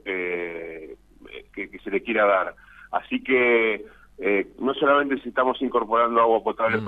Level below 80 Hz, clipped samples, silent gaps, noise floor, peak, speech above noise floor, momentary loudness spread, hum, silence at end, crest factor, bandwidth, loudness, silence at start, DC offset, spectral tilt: -58 dBFS; under 0.1%; none; -44 dBFS; -8 dBFS; 22 dB; 16 LU; none; 0 s; 16 dB; 4.6 kHz; -23 LUFS; 0.05 s; under 0.1%; -7 dB/octave